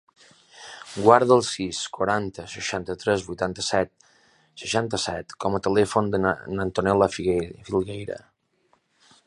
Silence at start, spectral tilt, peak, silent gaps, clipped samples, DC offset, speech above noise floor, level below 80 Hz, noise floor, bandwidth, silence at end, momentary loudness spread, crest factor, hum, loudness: 0.55 s; -4.5 dB/octave; -2 dBFS; none; under 0.1%; under 0.1%; 43 dB; -52 dBFS; -67 dBFS; 11.5 kHz; 1.1 s; 15 LU; 24 dB; none; -24 LUFS